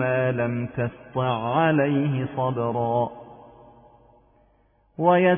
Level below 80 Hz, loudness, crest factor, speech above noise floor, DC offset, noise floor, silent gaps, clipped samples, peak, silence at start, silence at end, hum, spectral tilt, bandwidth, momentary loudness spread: -60 dBFS; -24 LUFS; 18 dB; 39 dB; under 0.1%; -62 dBFS; none; under 0.1%; -6 dBFS; 0 s; 0 s; none; -11.5 dB/octave; 3.6 kHz; 9 LU